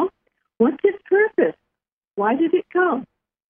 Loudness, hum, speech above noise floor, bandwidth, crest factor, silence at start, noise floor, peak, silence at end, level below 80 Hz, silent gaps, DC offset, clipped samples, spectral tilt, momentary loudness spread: -20 LUFS; none; 65 dB; 3.6 kHz; 16 dB; 0 s; -83 dBFS; -4 dBFS; 0.45 s; -70 dBFS; 1.92-2.02 s; under 0.1%; under 0.1%; -10 dB/octave; 7 LU